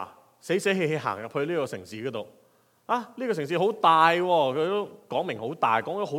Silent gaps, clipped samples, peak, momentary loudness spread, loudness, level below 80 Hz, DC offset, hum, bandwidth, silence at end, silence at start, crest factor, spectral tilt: none; under 0.1%; -6 dBFS; 14 LU; -26 LUFS; -80 dBFS; under 0.1%; none; 16.5 kHz; 0 s; 0 s; 22 dB; -5 dB/octave